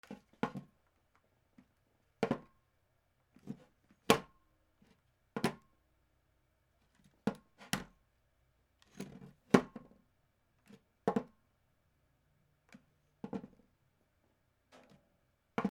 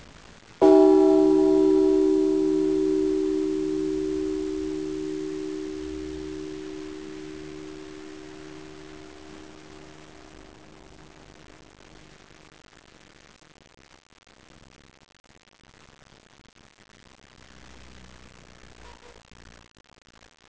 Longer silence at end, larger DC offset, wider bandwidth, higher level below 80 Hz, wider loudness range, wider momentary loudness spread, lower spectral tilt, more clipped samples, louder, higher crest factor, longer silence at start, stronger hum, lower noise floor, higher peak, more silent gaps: second, 0 s vs 1.55 s; second, under 0.1% vs 0.2%; first, 18 kHz vs 8 kHz; second, -72 dBFS vs -54 dBFS; second, 16 LU vs 27 LU; about the same, 25 LU vs 27 LU; second, -5 dB/octave vs -6.5 dB/octave; neither; second, -37 LUFS vs -23 LUFS; first, 34 dB vs 22 dB; second, 0.1 s vs 0.6 s; neither; first, -77 dBFS vs -51 dBFS; second, -8 dBFS vs -4 dBFS; second, none vs 15.20-15.24 s